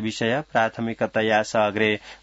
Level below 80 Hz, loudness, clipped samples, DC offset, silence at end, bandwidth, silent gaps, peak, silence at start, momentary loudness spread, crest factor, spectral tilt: -60 dBFS; -23 LUFS; under 0.1%; under 0.1%; 0.1 s; 8 kHz; none; -6 dBFS; 0 s; 4 LU; 18 dB; -5 dB/octave